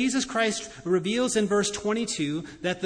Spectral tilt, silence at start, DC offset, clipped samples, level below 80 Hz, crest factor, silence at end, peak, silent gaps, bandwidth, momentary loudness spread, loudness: -3.5 dB/octave; 0 s; under 0.1%; under 0.1%; -58 dBFS; 16 dB; 0 s; -10 dBFS; none; 10.5 kHz; 7 LU; -26 LUFS